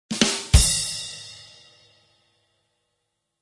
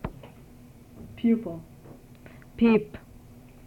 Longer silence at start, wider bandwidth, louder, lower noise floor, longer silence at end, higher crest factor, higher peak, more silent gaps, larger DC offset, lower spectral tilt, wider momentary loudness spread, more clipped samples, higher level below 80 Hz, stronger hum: about the same, 0.1 s vs 0.05 s; first, 11.5 kHz vs 4.7 kHz; first, -20 LUFS vs -25 LUFS; first, -77 dBFS vs -50 dBFS; first, 2 s vs 0.7 s; about the same, 24 dB vs 20 dB; first, 0 dBFS vs -10 dBFS; neither; neither; second, -3 dB/octave vs -8 dB/octave; second, 22 LU vs 27 LU; neither; first, -30 dBFS vs -52 dBFS; neither